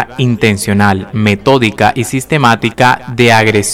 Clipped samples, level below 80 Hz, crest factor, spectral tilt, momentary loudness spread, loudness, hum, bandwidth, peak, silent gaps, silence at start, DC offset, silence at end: 0.3%; -40 dBFS; 10 dB; -5 dB/octave; 5 LU; -10 LUFS; none; 16.5 kHz; 0 dBFS; none; 0 s; under 0.1%; 0 s